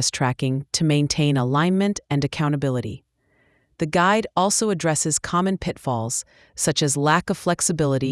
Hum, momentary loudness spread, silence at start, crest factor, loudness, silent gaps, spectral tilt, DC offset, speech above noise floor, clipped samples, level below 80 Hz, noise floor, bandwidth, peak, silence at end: none; 7 LU; 0 s; 18 dB; -21 LUFS; none; -4.5 dB/octave; under 0.1%; 42 dB; under 0.1%; -50 dBFS; -63 dBFS; 12 kHz; -4 dBFS; 0 s